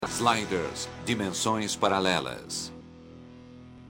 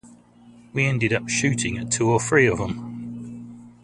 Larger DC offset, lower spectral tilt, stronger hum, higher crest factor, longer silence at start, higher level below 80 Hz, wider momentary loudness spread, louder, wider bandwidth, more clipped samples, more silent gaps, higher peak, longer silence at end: neither; about the same, -3.5 dB/octave vs -4.5 dB/octave; neither; about the same, 22 dB vs 20 dB; about the same, 0 s vs 0.05 s; second, -60 dBFS vs -50 dBFS; first, 23 LU vs 18 LU; second, -28 LUFS vs -22 LUFS; first, 16.5 kHz vs 11.5 kHz; neither; neither; second, -8 dBFS vs -4 dBFS; second, 0 s vs 0.15 s